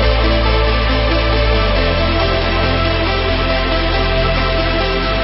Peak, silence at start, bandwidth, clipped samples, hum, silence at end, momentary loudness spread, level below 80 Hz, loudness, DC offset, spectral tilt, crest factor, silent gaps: -2 dBFS; 0 s; 5.8 kHz; under 0.1%; none; 0 s; 2 LU; -18 dBFS; -15 LUFS; under 0.1%; -9.5 dB/octave; 12 dB; none